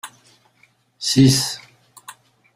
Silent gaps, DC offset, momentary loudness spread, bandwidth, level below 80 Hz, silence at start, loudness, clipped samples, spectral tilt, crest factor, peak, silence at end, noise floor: none; under 0.1%; 20 LU; 15.5 kHz; -52 dBFS; 0.05 s; -17 LUFS; under 0.1%; -4.5 dB/octave; 20 dB; -2 dBFS; 0.45 s; -59 dBFS